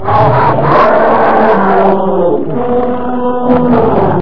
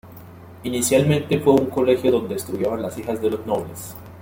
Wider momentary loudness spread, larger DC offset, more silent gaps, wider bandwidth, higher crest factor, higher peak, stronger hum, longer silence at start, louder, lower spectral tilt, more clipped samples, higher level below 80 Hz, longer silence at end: second, 6 LU vs 13 LU; first, 10% vs under 0.1%; neither; second, 5.4 kHz vs 17 kHz; second, 10 dB vs 18 dB; about the same, 0 dBFS vs -2 dBFS; neither; about the same, 0 s vs 0.05 s; first, -9 LUFS vs -21 LUFS; first, -9.5 dB/octave vs -5.5 dB/octave; first, 0.4% vs under 0.1%; first, -36 dBFS vs -54 dBFS; about the same, 0 s vs 0 s